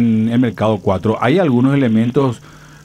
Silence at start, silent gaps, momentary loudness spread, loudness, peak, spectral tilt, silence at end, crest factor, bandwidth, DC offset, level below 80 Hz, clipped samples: 0 s; none; 4 LU; -15 LUFS; 0 dBFS; -8 dB/octave; 0.45 s; 14 dB; 9.8 kHz; under 0.1%; -50 dBFS; under 0.1%